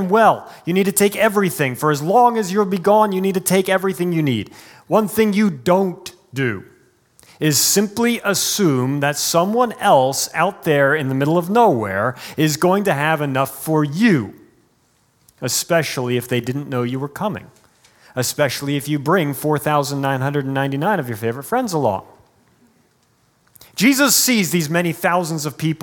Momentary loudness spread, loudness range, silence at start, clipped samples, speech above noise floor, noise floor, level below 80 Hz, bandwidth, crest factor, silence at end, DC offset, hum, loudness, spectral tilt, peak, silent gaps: 9 LU; 6 LU; 0 s; under 0.1%; 42 dB; -60 dBFS; -62 dBFS; 18 kHz; 18 dB; 0.05 s; under 0.1%; none; -18 LUFS; -4.5 dB/octave; -2 dBFS; none